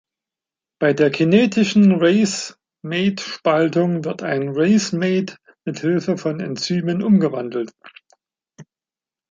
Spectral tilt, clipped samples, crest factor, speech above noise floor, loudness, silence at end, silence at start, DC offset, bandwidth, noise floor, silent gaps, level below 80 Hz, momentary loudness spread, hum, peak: -6 dB/octave; under 0.1%; 18 dB; over 72 dB; -18 LUFS; 0.7 s; 0.8 s; under 0.1%; 9.4 kHz; under -90 dBFS; none; -64 dBFS; 12 LU; none; -2 dBFS